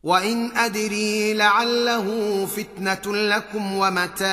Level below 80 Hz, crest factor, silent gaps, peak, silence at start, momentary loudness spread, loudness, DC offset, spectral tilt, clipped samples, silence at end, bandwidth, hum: -60 dBFS; 18 dB; none; -4 dBFS; 0.05 s; 8 LU; -21 LUFS; under 0.1%; -3 dB/octave; under 0.1%; 0 s; 15.5 kHz; none